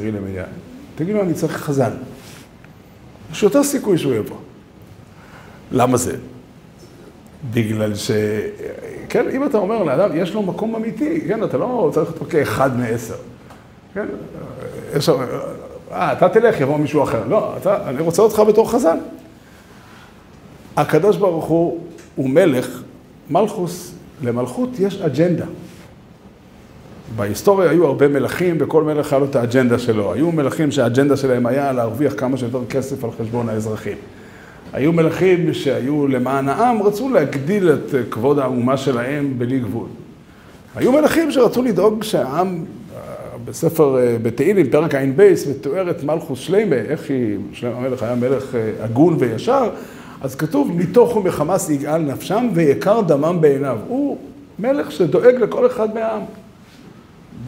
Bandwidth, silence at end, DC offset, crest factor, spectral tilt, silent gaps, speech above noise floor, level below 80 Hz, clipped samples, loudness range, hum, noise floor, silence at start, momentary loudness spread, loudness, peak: 16 kHz; 0 s; under 0.1%; 18 dB; -6.5 dB/octave; none; 26 dB; -52 dBFS; under 0.1%; 6 LU; none; -43 dBFS; 0 s; 16 LU; -18 LUFS; 0 dBFS